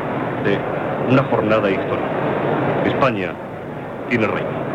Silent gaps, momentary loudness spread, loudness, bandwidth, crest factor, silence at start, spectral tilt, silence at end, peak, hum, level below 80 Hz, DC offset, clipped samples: none; 11 LU; -20 LUFS; 9.4 kHz; 16 dB; 0 s; -8 dB/octave; 0 s; -4 dBFS; none; -48 dBFS; under 0.1%; under 0.1%